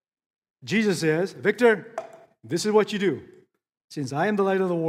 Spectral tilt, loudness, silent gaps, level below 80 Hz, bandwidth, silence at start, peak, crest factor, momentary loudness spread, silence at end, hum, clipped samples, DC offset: -5.5 dB/octave; -24 LUFS; 3.84-3.88 s; -74 dBFS; 15.5 kHz; 0.65 s; -6 dBFS; 18 dB; 16 LU; 0 s; none; under 0.1%; under 0.1%